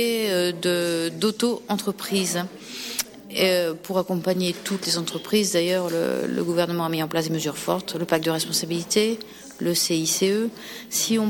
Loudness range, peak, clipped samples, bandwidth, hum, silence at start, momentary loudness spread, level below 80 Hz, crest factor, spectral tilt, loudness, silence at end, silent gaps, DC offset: 2 LU; -6 dBFS; under 0.1%; 17 kHz; none; 0 s; 7 LU; -64 dBFS; 18 dB; -3.5 dB/octave; -24 LUFS; 0 s; none; under 0.1%